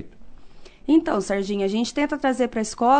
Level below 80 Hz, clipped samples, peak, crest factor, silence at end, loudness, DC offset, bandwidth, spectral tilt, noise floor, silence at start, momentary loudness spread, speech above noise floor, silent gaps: -48 dBFS; under 0.1%; -8 dBFS; 16 dB; 0 s; -23 LUFS; under 0.1%; 9.4 kHz; -5 dB/octave; -41 dBFS; 0 s; 5 LU; 20 dB; none